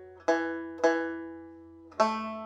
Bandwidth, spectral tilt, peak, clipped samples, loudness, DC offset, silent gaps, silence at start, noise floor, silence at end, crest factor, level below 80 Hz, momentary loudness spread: 9.6 kHz; -4 dB/octave; -10 dBFS; under 0.1%; -30 LUFS; under 0.1%; none; 0 s; -50 dBFS; 0 s; 22 dB; -76 dBFS; 19 LU